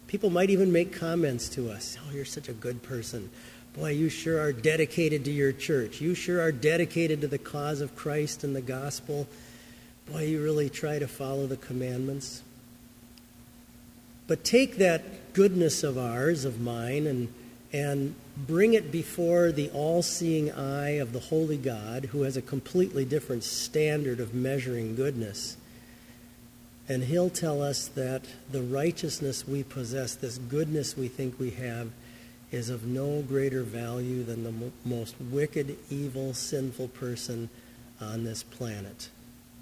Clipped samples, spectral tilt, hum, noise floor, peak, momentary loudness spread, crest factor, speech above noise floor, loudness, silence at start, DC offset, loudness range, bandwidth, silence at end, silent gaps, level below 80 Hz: under 0.1%; -5.5 dB/octave; none; -53 dBFS; -8 dBFS; 13 LU; 22 dB; 23 dB; -30 LUFS; 0 s; under 0.1%; 7 LU; 16 kHz; 0 s; none; -58 dBFS